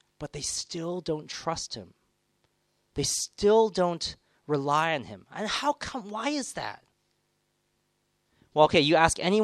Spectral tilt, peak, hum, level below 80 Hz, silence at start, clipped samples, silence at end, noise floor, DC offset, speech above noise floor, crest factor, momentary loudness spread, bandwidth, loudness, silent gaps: -3.5 dB/octave; -4 dBFS; 50 Hz at -60 dBFS; -56 dBFS; 0.2 s; under 0.1%; 0 s; -74 dBFS; under 0.1%; 47 dB; 24 dB; 14 LU; 13.5 kHz; -27 LUFS; none